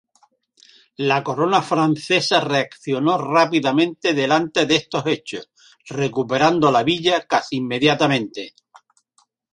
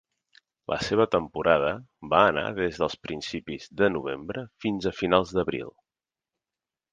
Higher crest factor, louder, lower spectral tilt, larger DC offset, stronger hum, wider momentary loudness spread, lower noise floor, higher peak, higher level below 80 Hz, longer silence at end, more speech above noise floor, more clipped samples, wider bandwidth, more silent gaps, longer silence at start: second, 18 dB vs 24 dB; first, -19 LUFS vs -26 LUFS; about the same, -5 dB/octave vs -5.5 dB/octave; neither; neither; second, 8 LU vs 13 LU; second, -63 dBFS vs under -90 dBFS; about the same, -2 dBFS vs -4 dBFS; second, -62 dBFS vs -54 dBFS; second, 1.05 s vs 1.2 s; second, 45 dB vs over 64 dB; neither; first, 11 kHz vs 9.4 kHz; neither; first, 1 s vs 0.7 s